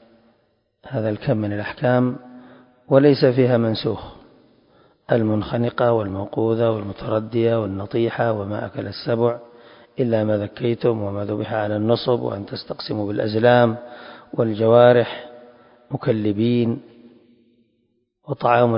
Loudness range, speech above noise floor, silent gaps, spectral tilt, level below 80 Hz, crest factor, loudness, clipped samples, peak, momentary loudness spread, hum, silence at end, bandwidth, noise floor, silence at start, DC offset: 5 LU; 49 dB; none; -12 dB/octave; -52 dBFS; 20 dB; -20 LUFS; under 0.1%; 0 dBFS; 15 LU; none; 0 s; 5.4 kHz; -68 dBFS; 0.85 s; under 0.1%